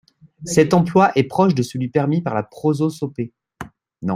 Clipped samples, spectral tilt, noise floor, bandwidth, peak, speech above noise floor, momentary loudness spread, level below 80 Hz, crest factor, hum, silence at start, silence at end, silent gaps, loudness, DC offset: under 0.1%; -6.5 dB/octave; -38 dBFS; 15.5 kHz; -2 dBFS; 21 dB; 22 LU; -56 dBFS; 18 dB; none; 0.4 s; 0 s; none; -18 LUFS; under 0.1%